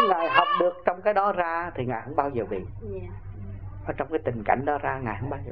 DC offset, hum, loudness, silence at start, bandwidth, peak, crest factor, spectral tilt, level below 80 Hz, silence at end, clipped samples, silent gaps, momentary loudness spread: 0.4%; none; -26 LUFS; 0 s; 5.8 kHz; -4 dBFS; 22 dB; -9 dB/octave; -46 dBFS; 0 s; under 0.1%; none; 16 LU